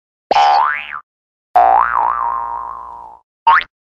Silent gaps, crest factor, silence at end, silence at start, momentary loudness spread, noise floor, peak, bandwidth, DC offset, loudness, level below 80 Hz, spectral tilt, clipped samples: 1.03-1.54 s, 3.24-3.46 s; 14 dB; 0.2 s; 0.3 s; 19 LU; under -90 dBFS; 0 dBFS; 7.6 kHz; under 0.1%; -14 LUFS; -50 dBFS; -2 dB/octave; under 0.1%